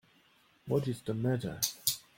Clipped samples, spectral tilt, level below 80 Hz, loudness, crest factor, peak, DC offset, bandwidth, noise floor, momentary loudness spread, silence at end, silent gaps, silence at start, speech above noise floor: under 0.1%; -4.5 dB/octave; -64 dBFS; -33 LUFS; 26 dB; -10 dBFS; under 0.1%; 17 kHz; -67 dBFS; 5 LU; 0.15 s; none; 0.65 s; 34 dB